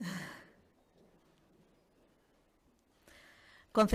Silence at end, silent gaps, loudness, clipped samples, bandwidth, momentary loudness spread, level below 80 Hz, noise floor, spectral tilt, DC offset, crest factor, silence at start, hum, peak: 0 s; none; -37 LUFS; under 0.1%; 15 kHz; 28 LU; -72 dBFS; -71 dBFS; -5.5 dB/octave; under 0.1%; 22 dB; 0 s; none; -18 dBFS